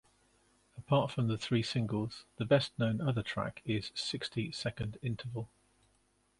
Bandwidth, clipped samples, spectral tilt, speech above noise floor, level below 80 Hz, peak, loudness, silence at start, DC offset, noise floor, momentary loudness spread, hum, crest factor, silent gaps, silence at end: 11.5 kHz; under 0.1%; -6 dB/octave; 39 dB; -62 dBFS; -12 dBFS; -35 LUFS; 0.75 s; under 0.1%; -73 dBFS; 12 LU; none; 24 dB; none; 0.95 s